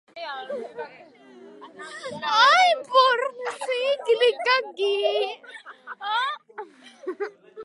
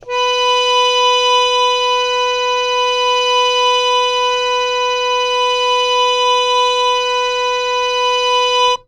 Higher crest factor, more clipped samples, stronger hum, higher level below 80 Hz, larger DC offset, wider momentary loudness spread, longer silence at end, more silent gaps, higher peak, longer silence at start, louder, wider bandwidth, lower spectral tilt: first, 20 dB vs 12 dB; neither; neither; second, -84 dBFS vs -50 dBFS; neither; first, 22 LU vs 4 LU; about the same, 0 s vs 0.1 s; neither; about the same, -6 dBFS vs -4 dBFS; about the same, 0.15 s vs 0.05 s; second, -22 LUFS vs -13 LUFS; about the same, 11.5 kHz vs 12.5 kHz; first, -1 dB/octave vs 2 dB/octave